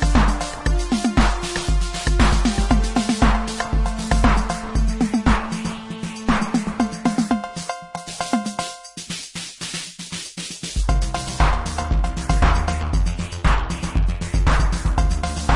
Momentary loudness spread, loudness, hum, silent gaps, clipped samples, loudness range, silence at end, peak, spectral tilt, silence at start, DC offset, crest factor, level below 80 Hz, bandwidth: 11 LU; -22 LUFS; none; none; under 0.1%; 6 LU; 0 s; -2 dBFS; -5 dB/octave; 0 s; under 0.1%; 18 dB; -22 dBFS; 11.5 kHz